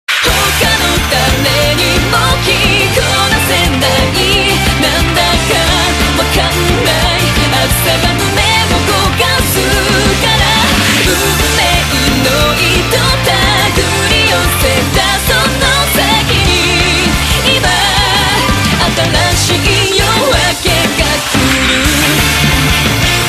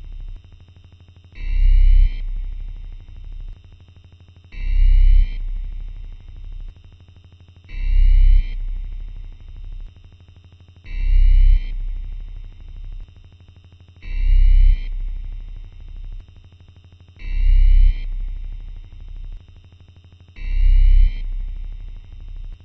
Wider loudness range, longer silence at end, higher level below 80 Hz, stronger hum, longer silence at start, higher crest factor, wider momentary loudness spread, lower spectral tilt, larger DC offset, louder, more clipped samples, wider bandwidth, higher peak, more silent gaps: about the same, 1 LU vs 1 LU; about the same, 0 s vs 0.1 s; about the same, -20 dBFS vs -18 dBFS; second, none vs 50 Hz at -55 dBFS; about the same, 0.1 s vs 0.05 s; about the same, 10 dB vs 14 dB; second, 2 LU vs 23 LU; second, -3 dB/octave vs -7.5 dB/octave; neither; first, -9 LUFS vs -22 LUFS; neither; first, 14.5 kHz vs 4.1 kHz; first, 0 dBFS vs -4 dBFS; neither